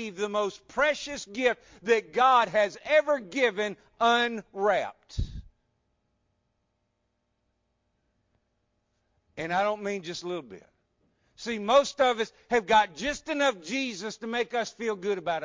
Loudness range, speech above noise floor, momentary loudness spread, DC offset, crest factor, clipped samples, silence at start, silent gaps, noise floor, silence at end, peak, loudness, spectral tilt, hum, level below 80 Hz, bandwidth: 10 LU; 50 dB; 13 LU; under 0.1%; 18 dB; under 0.1%; 0 s; none; -77 dBFS; 0 s; -10 dBFS; -27 LUFS; -3.5 dB/octave; none; -50 dBFS; 7.6 kHz